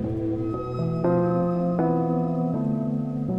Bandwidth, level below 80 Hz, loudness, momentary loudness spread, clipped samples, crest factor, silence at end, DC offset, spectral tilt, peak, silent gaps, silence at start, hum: 5.4 kHz; -50 dBFS; -25 LUFS; 5 LU; under 0.1%; 12 dB; 0 s; under 0.1%; -11 dB/octave; -12 dBFS; none; 0 s; none